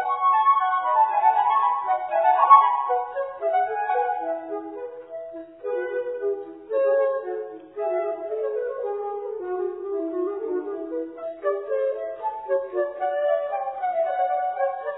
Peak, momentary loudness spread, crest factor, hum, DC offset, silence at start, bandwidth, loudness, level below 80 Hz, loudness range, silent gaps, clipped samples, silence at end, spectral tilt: -2 dBFS; 13 LU; 22 dB; none; under 0.1%; 0 s; 4 kHz; -24 LUFS; -74 dBFS; 9 LU; none; under 0.1%; 0 s; -7 dB/octave